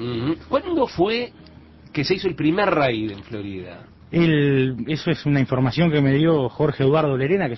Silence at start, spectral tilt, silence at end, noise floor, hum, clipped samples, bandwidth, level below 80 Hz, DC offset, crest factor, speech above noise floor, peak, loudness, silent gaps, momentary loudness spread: 0 s; -8 dB/octave; 0 s; -45 dBFS; none; under 0.1%; 6 kHz; -48 dBFS; under 0.1%; 14 dB; 25 dB; -6 dBFS; -20 LUFS; none; 13 LU